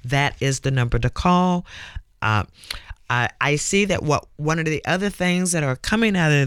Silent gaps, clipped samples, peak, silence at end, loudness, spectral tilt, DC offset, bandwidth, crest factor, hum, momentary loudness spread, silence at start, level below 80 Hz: none; under 0.1%; -6 dBFS; 0 s; -21 LUFS; -5 dB/octave; under 0.1%; 15 kHz; 16 dB; none; 13 LU; 0.05 s; -38 dBFS